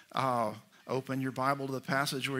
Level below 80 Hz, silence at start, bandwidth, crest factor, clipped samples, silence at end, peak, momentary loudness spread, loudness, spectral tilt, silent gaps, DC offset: -78 dBFS; 0.15 s; 16 kHz; 20 dB; under 0.1%; 0 s; -14 dBFS; 7 LU; -33 LUFS; -5 dB/octave; none; under 0.1%